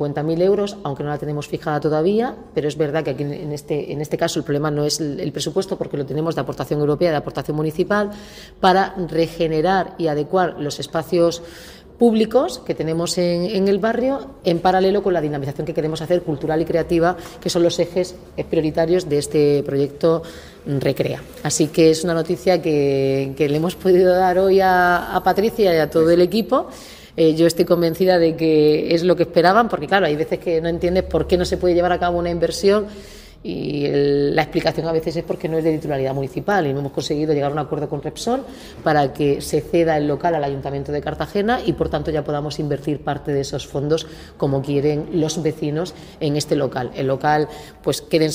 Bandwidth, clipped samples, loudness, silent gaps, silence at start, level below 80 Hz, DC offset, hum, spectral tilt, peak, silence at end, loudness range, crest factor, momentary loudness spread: 16 kHz; under 0.1%; -19 LUFS; none; 0 s; -44 dBFS; under 0.1%; none; -5.5 dB/octave; 0 dBFS; 0 s; 6 LU; 18 dB; 10 LU